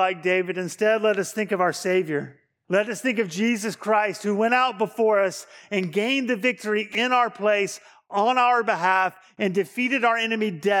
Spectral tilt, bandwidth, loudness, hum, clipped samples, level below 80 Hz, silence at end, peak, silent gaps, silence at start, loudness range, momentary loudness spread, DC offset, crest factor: -4 dB/octave; 18 kHz; -23 LUFS; none; under 0.1%; -82 dBFS; 0 s; -6 dBFS; none; 0 s; 2 LU; 7 LU; under 0.1%; 16 dB